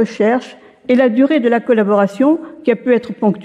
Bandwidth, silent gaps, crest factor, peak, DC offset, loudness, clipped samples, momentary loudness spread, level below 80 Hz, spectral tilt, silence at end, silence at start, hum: 9.4 kHz; none; 12 dB; -2 dBFS; under 0.1%; -14 LUFS; under 0.1%; 6 LU; -66 dBFS; -7.5 dB/octave; 0 s; 0 s; none